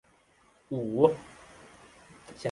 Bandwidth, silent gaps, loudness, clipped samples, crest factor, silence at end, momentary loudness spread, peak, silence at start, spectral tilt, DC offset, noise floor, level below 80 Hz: 11.5 kHz; none; -29 LUFS; under 0.1%; 26 dB; 0 s; 26 LU; -6 dBFS; 0.7 s; -7.5 dB/octave; under 0.1%; -64 dBFS; -66 dBFS